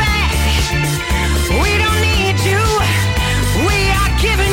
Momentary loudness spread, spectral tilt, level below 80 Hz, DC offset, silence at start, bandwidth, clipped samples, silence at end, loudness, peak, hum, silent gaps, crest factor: 3 LU; -4 dB/octave; -20 dBFS; under 0.1%; 0 s; 17 kHz; under 0.1%; 0 s; -14 LUFS; -6 dBFS; none; none; 8 dB